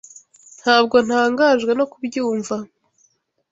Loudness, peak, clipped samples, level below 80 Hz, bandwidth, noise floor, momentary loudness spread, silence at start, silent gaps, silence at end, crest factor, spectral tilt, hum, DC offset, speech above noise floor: -18 LUFS; 0 dBFS; under 0.1%; -64 dBFS; 8 kHz; -63 dBFS; 11 LU; 0.65 s; none; 0.85 s; 18 dB; -3.5 dB/octave; none; under 0.1%; 46 dB